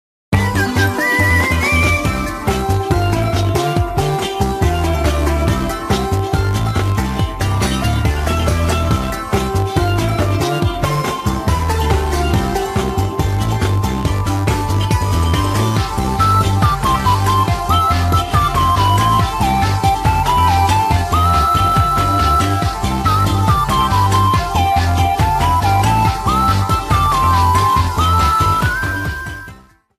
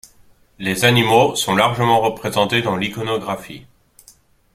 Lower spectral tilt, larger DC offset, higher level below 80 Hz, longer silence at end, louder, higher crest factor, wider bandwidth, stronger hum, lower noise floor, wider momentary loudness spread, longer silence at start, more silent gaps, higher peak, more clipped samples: about the same, -5.5 dB/octave vs -4.5 dB/octave; neither; first, -24 dBFS vs -52 dBFS; second, 0.4 s vs 0.95 s; about the same, -15 LUFS vs -17 LUFS; about the same, 14 dB vs 18 dB; about the same, 15 kHz vs 16 kHz; neither; second, -40 dBFS vs -51 dBFS; second, 5 LU vs 12 LU; second, 0.3 s vs 0.6 s; neither; about the same, -2 dBFS vs 0 dBFS; neither